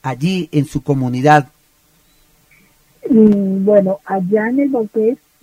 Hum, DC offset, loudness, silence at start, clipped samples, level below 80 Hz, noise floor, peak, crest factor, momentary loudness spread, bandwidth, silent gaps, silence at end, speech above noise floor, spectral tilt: none; under 0.1%; -15 LUFS; 0.05 s; under 0.1%; -48 dBFS; -55 dBFS; 0 dBFS; 16 dB; 8 LU; 15 kHz; none; 0.25 s; 41 dB; -7.5 dB/octave